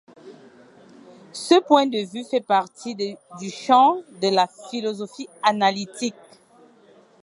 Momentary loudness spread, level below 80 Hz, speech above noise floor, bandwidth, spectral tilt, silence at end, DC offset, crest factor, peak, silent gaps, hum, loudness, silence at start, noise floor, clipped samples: 16 LU; -78 dBFS; 32 dB; 11.5 kHz; -4 dB/octave; 1.1 s; under 0.1%; 22 dB; -2 dBFS; none; none; -21 LUFS; 0.25 s; -53 dBFS; under 0.1%